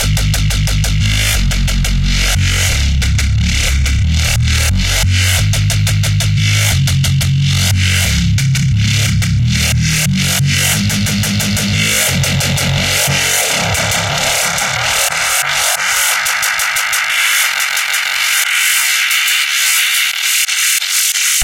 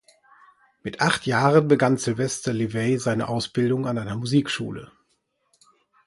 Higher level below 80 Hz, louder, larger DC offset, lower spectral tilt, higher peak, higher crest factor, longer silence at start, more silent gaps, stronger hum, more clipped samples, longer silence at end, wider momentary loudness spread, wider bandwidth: first, -22 dBFS vs -58 dBFS; first, -12 LUFS vs -23 LUFS; neither; second, -2.5 dB/octave vs -5.5 dB/octave; first, 0 dBFS vs -4 dBFS; second, 12 dB vs 20 dB; second, 0 s vs 0.85 s; neither; neither; neither; second, 0 s vs 1.2 s; second, 3 LU vs 11 LU; first, 17 kHz vs 11.5 kHz